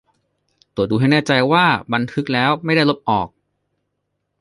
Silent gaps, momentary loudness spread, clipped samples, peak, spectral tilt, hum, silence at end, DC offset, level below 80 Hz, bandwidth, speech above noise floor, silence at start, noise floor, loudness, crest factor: none; 8 LU; under 0.1%; -2 dBFS; -6.5 dB/octave; 50 Hz at -40 dBFS; 1.15 s; under 0.1%; -52 dBFS; 11.5 kHz; 57 dB; 0.75 s; -74 dBFS; -17 LUFS; 18 dB